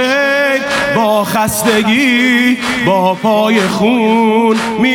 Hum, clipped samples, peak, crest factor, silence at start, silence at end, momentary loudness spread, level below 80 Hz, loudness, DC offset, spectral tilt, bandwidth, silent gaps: none; under 0.1%; 0 dBFS; 12 dB; 0 s; 0 s; 3 LU; -46 dBFS; -11 LUFS; under 0.1%; -4 dB/octave; 18 kHz; none